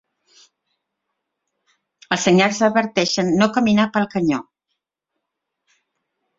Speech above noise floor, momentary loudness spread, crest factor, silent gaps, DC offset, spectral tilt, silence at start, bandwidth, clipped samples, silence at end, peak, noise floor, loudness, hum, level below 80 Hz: 63 dB; 7 LU; 20 dB; none; under 0.1%; -4.5 dB/octave; 2.1 s; 7.8 kHz; under 0.1%; 1.95 s; 0 dBFS; -80 dBFS; -18 LUFS; none; -60 dBFS